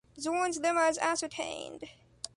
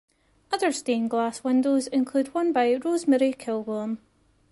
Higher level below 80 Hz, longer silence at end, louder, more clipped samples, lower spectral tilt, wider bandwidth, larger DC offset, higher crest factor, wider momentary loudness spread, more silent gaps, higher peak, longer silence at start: about the same, -68 dBFS vs -68 dBFS; second, 0.1 s vs 0.55 s; second, -31 LUFS vs -25 LUFS; neither; second, -2 dB/octave vs -4 dB/octave; about the same, 11.5 kHz vs 11.5 kHz; neither; about the same, 18 dB vs 16 dB; first, 17 LU vs 8 LU; neither; second, -14 dBFS vs -10 dBFS; second, 0.15 s vs 0.5 s